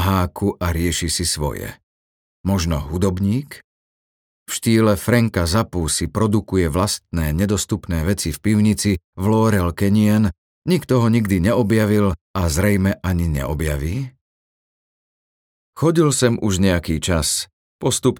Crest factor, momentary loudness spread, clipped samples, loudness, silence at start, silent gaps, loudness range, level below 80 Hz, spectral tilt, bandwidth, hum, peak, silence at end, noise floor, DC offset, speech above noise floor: 18 dB; 7 LU; under 0.1%; -19 LUFS; 0 s; 1.83-2.44 s, 3.64-4.46 s, 9.04-9.13 s, 10.38-10.62 s, 12.21-12.34 s, 14.21-15.73 s, 17.53-17.79 s; 5 LU; -34 dBFS; -5.5 dB/octave; 19 kHz; none; -2 dBFS; 0 s; under -90 dBFS; under 0.1%; over 72 dB